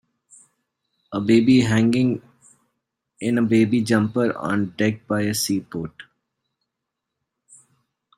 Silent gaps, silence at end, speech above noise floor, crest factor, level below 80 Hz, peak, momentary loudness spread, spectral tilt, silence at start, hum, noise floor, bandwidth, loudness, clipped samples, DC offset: none; 2.15 s; 62 dB; 18 dB; -58 dBFS; -4 dBFS; 14 LU; -5.5 dB/octave; 1.1 s; none; -82 dBFS; 15 kHz; -21 LUFS; under 0.1%; under 0.1%